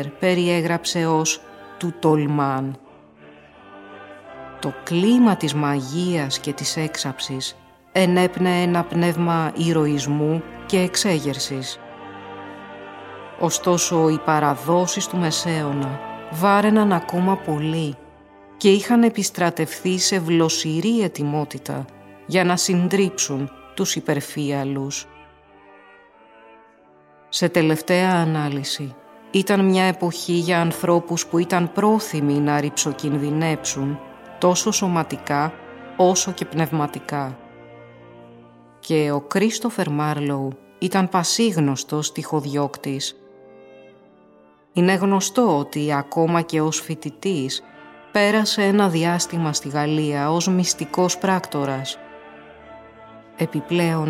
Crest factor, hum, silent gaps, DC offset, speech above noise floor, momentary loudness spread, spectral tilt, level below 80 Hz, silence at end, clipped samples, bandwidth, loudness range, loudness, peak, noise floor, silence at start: 18 dB; none; none; under 0.1%; 32 dB; 13 LU; -4.5 dB/octave; -60 dBFS; 0 s; under 0.1%; 16.5 kHz; 5 LU; -21 LUFS; -2 dBFS; -52 dBFS; 0 s